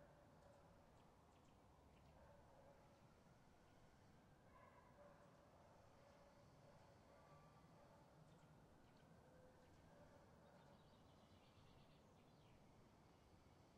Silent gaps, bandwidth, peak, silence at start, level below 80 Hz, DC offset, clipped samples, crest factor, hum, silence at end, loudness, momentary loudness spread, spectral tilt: none; 9.4 kHz; -54 dBFS; 0 s; -82 dBFS; under 0.1%; under 0.1%; 16 dB; none; 0 s; -70 LUFS; 1 LU; -5.5 dB/octave